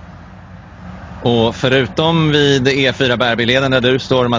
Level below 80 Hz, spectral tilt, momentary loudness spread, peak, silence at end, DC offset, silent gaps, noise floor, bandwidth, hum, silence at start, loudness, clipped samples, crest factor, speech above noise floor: -40 dBFS; -5.5 dB/octave; 8 LU; 0 dBFS; 0 s; under 0.1%; none; -36 dBFS; 7.6 kHz; none; 0 s; -13 LUFS; under 0.1%; 14 dB; 22 dB